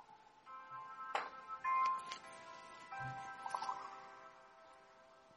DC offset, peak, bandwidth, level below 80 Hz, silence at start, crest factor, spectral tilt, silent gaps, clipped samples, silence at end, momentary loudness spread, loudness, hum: under 0.1%; -24 dBFS; 11.5 kHz; -82 dBFS; 0 s; 22 dB; -3 dB/octave; none; under 0.1%; 0 s; 24 LU; -44 LUFS; none